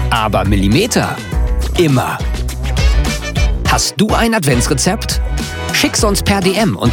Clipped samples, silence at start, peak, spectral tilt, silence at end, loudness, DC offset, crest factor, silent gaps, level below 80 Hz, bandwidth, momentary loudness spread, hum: under 0.1%; 0 s; 0 dBFS; -4.5 dB/octave; 0 s; -14 LUFS; under 0.1%; 12 dB; none; -20 dBFS; 18 kHz; 6 LU; none